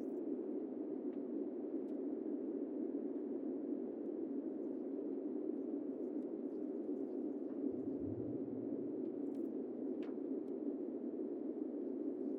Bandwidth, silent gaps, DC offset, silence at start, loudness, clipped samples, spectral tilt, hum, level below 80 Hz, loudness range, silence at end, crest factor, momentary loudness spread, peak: 3.3 kHz; none; under 0.1%; 0 s; -43 LUFS; under 0.1%; -10 dB/octave; none; -82 dBFS; 0 LU; 0 s; 14 dB; 1 LU; -30 dBFS